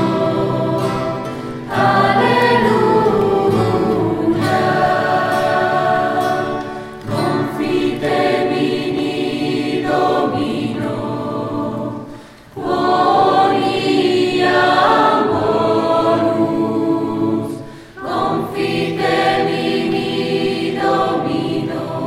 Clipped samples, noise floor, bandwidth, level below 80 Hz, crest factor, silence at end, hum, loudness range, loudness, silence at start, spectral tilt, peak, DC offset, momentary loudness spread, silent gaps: under 0.1%; -36 dBFS; 15.5 kHz; -48 dBFS; 16 dB; 0 s; none; 4 LU; -16 LUFS; 0 s; -6 dB/octave; 0 dBFS; under 0.1%; 10 LU; none